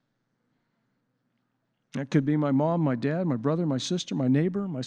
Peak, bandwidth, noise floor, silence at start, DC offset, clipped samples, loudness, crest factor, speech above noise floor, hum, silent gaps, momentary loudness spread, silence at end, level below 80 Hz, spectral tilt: -10 dBFS; 9.6 kHz; -76 dBFS; 1.95 s; under 0.1%; under 0.1%; -26 LUFS; 18 dB; 51 dB; none; none; 5 LU; 0 s; -74 dBFS; -7 dB/octave